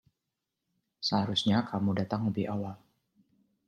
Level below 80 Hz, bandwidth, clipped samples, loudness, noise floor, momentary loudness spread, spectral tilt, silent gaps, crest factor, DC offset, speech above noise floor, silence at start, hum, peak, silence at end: -70 dBFS; 9.6 kHz; under 0.1%; -30 LUFS; -86 dBFS; 8 LU; -6 dB/octave; none; 20 dB; under 0.1%; 56 dB; 1 s; none; -12 dBFS; 0.9 s